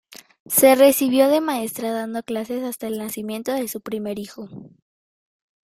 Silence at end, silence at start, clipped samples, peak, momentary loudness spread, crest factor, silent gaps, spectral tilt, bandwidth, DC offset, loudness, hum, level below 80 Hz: 0.95 s; 0.1 s; under 0.1%; -2 dBFS; 15 LU; 20 dB; 0.40-0.45 s; -3.5 dB/octave; 16 kHz; under 0.1%; -20 LUFS; none; -66 dBFS